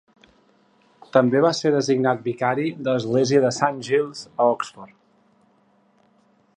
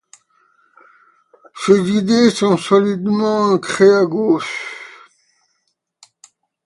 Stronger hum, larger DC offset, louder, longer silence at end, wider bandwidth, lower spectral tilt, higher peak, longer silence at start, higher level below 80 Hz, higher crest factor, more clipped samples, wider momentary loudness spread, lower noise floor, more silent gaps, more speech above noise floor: neither; neither; second, -21 LUFS vs -15 LUFS; about the same, 1.7 s vs 1.75 s; second, 10 kHz vs 11.5 kHz; about the same, -5.5 dB/octave vs -5.5 dB/octave; about the same, -2 dBFS vs 0 dBFS; second, 1.15 s vs 1.55 s; second, -70 dBFS vs -60 dBFS; about the same, 20 dB vs 18 dB; neither; second, 6 LU vs 13 LU; second, -61 dBFS vs -70 dBFS; neither; second, 40 dB vs 56 dB